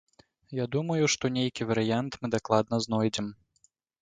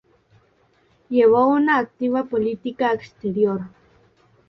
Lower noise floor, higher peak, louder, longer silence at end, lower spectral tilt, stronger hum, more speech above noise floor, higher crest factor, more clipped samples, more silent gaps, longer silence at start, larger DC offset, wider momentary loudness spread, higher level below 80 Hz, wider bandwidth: first, -69 dBFS vs -60 dBFS; about the same, -8 dBFS vs -6 dBFS; second, -29 LUFS vs -20 LUFS; about the same, 0.7 s vs 0.8 s; second, -5 dB/octave vs -8 dB/octave; neither; about the same, 40 dB vs 41 dB; first, 22 dB vs 16 dB; neither; neither; second, 0.5 s vs 1.1 s; neither; about the same, 9 LU vs 11 LU; about the same, -62 dBFS vs -62 dBFS; first, 9.4 kHz vs 6 kHz